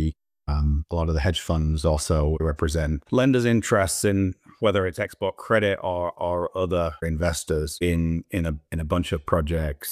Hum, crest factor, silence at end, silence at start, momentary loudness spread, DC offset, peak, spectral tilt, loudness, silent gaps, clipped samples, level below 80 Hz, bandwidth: none; 18 dB; 0 s; 0 s; 7 LU; under 0.1%; -6 dBFS; -5.5 dB/octave; -24 LUFS; none; under 0.1%; -32 dBFS; 15.5 kHz